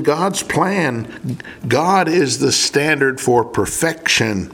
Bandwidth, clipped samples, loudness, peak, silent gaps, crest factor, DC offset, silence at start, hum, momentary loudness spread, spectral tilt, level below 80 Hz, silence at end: 17.5 kHz; under 0.1%; -16 LUFS; 0 dBFS; none; 16 dB; under 0.1%; 0 s; none; 11 LU; -3.5 dB/octave; -48 dBFS; 0 s